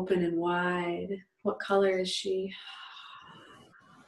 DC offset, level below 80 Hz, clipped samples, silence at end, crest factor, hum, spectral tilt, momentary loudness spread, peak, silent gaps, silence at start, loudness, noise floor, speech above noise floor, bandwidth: under 0.1%; -70 dBFS; under 0.1%; 0.5 s; 18 dB; none; -5 dB/octave; 20 LU; -14 dBFS; none; 0 s; -30 LUFS; -57 dBFS; 27 dB; 12 kHz